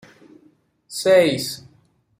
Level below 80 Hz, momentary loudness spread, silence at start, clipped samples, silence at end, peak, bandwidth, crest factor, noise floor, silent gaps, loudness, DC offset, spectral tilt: -64 dBFS; 18 LU; 0.9 s; under 0.1%; 0.6 s; -4 dBFS; 16 kHz; 18 dB; -59 dBFS; none; -18 LUFS; under 0.1%; -4 dB/octave